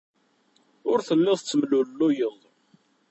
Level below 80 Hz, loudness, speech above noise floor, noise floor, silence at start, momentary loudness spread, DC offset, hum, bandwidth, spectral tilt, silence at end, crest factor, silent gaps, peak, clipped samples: -74 dBFS; -24 LUFS; 42 dB; -65 dBFS; 0.85 s; 6 LU; under 0.1%; none; 8.2 kHz; -5.5 dB/octave; 0.8 s; 16 dB; none; -10 dBFS; under 0.1%